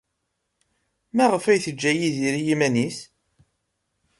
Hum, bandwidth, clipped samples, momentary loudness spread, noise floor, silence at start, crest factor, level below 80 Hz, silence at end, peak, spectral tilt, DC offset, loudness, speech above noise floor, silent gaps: none; 11.5 kHz; under 0.1%; 8 LU; -77 dBFS; 1.15 s; 18 dB; -66 dBFS; 1.15 s; -6 dBFS; -5 dB/octave; under 0.1%; -22 LUFS; 56 dB; none